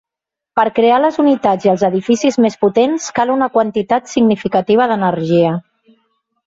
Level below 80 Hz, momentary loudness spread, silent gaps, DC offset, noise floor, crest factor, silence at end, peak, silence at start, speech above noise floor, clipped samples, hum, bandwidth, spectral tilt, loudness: -56 dBFS; 5 LU; none; under 0.1%; -85 dBFS; 14 dB; 0.85 s; 0 dBFS; 0.55 s; 71 dB; under 0.1%; none; 7.8 kHz; -6 dB/octave; -14 LUFS